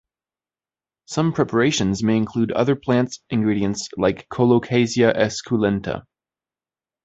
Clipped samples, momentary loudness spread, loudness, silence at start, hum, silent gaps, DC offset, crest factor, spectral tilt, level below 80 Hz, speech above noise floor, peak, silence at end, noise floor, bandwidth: under 0.1%; 6 LU; -20 LUFS; 1.1 s; none; none; under 0.1%; 18 dB; -5.5 dB/octave; -50 dBFS; over 70 dB; -2 dBFS; 1.05 s; under -90 dBFS; 8.2 kHz